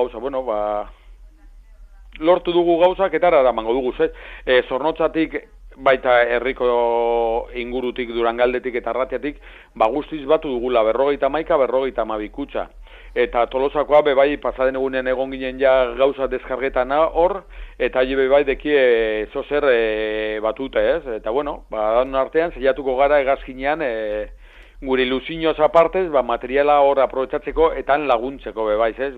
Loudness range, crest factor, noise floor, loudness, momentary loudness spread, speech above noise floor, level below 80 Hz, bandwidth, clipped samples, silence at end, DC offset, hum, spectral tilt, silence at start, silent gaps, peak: 3 LU; 16 dB; -44 dBFS; -19 LUFS; 9 LU; 25 dB; -40 dBFS; 4.7 kHz; under 0.1%; 0 s; under 0.1%; none; -7 dB/octave; 0 s; none; -2 dBFS